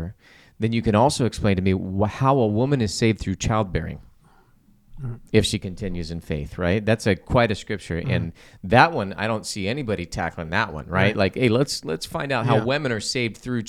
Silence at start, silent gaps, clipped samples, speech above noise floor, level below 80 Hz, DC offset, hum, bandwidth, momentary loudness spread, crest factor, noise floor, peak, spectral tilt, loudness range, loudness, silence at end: 0 s; none; under 0.1%; 34 dB; -42 dBFS; under 0.1%; none; 14 kHz; 11 LU; 22 dB; -56 dBFS; -2 dBFS; -5.5 dB/octave; 4 LU; -23 LUFS; 0 s